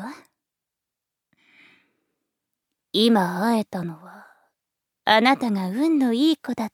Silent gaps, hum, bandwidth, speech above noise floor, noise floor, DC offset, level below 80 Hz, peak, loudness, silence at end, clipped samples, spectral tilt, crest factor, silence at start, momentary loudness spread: none; none; 16.5 kHz; 65 dB; -86 dBFS; under 0.1%; -76 dBFS; -2 dBFS; -21 LUFS; 0.05 s; under 0.1%; -5.5 dB/octave; 22 dB; 0 s; 14 LU